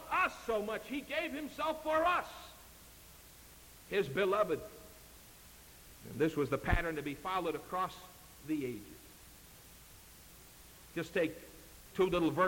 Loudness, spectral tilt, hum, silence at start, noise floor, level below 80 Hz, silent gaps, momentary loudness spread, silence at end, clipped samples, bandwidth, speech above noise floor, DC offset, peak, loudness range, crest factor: -36 LUFS; -5 dB/octave; none; 0 s; -57 dBFS; -52 dBFS; none; 23 LU; 0 s; under 0.1%; 17 kHz; 22 dB; under 0.1%; -16 dBFS; 7 LU; 22 dB